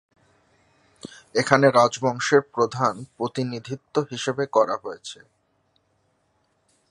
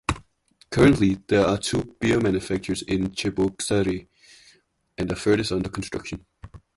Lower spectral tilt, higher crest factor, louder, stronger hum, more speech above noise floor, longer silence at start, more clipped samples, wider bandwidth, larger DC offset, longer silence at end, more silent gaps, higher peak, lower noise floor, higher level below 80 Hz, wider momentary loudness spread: about the same, -5 dB/octave vs -5.5 dB/octave; about the same, 24 dB vs 20 dB; about the same, -22 LUFS vs -23 LUFS; neither; first, 46 dB vs 38 dB; first, 1.05 s vs 0.1 s; neither; about the same, 11 kHz vs 11.5 kHz; neither; first, 1.75 s vs 0.2 s; neither; first, 0 dBFS vs -4 dBFS; first, -68 dBFS vs -61 dBFS; second, -68 dBFS vs -44 dBFS; first, 21 LU vs 13 LU